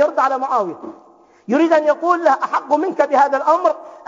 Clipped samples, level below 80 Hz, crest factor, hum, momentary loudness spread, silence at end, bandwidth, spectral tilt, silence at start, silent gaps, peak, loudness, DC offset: under 0.1%; -78 dBFS; 16 dB; none; 6 LU; 0.1 s; 7.6 kHz; -5 dB/octave; 0 s; none; -2 dBFS; -16 LUFS; under 0.1%